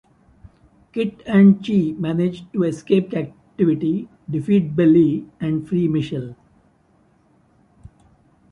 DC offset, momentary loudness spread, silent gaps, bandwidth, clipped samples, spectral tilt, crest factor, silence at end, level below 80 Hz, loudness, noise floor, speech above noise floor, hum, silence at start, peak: under 0.1%; 14 LU; none; 7 kHz; under 0.1%; -9 dB/octave; 16 dB; 2.2 s; -56 dBFS; -19 LUFS; -58 dBFS; 40 dB; none; 0.95 s; -4 dBFS